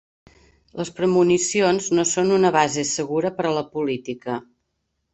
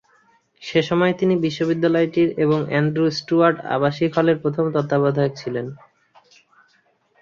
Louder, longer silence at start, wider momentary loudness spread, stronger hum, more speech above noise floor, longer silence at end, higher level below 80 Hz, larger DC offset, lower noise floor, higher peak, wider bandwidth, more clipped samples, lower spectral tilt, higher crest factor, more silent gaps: about the same, -21 LUFS vs -20 LUFS; first, 0.75 s vs 0.6 s; first, 13 LU vs 5 LU; neither; first, 54 dB vs 43 dB; second, 0.7 s vs 1.45 s; about the same, -60 dBFS vs -60 dBFS; neither; first, -75 dBFS vs -62 dBFS; about the same, -4 dBFS vs -2 dBFS; first, 8.4 kHz vs 7.2 kHz; neither; second, -4 dB/octave vs -7 dB/octave; about the same, 18 dB vs 18 dB; neither